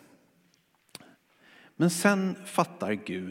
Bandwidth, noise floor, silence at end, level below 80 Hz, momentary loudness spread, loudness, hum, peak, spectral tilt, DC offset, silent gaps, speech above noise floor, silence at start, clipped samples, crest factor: 16.5 kHz; -68 dBFS; 0 s; -80 dBFS; 25 LU; -28 LUFS; none; -6 dBFS; -5 dB/octave; under 0.1%; none; 40 dB; 1.8 s; under 0.1%; 24 dB